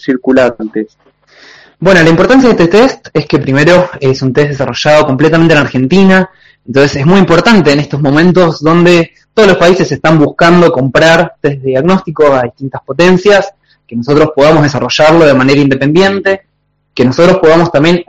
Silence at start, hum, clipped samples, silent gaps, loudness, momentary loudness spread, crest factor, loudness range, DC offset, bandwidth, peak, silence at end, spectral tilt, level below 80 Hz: 0 s; none; 2%; none; -7 LUFS; 9 LU; 8 dB; 2 LU; 2%; 10 kHz; 0 dBFS; 0.05 s; -6 dB/octave; -36 dBFS